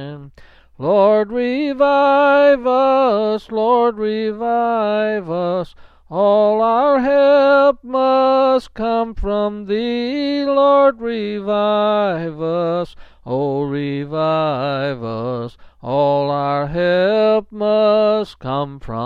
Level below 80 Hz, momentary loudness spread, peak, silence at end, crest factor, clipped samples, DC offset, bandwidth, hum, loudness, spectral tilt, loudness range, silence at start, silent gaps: -42 dBFS; 11 LU; -2 dBFS; 0 s; 14 dB; under 0.1%; under 0.1%; 6.4 kHz; none; -16 LUFS; -8 dB/octave; 5 LU; 0 s; none